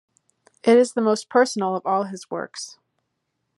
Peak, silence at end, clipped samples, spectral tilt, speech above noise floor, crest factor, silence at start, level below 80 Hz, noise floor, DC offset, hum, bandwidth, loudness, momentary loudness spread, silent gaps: -4 dBFS; 0.9 s; under 0.1%; -4.5 dB/octave; 56 dB; 18 dB; 0.65 s; -82 dBFS; -76 dBFS; under 0.1%; none; 11.5 kHz; -21 LUFS; 16 LU; none